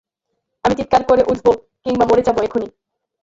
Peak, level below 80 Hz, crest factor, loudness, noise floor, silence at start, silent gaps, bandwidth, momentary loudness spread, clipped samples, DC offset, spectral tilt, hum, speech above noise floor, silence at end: 0 dBFS; -44 dBFS; 16 dB; -17 LUFS; -75 dBFS; 0.65 s; none; 7.8 kHz; 9 LU; under 0.1%; under 0.1%; -6 dB/octave; none; 60 dB; 0.55 s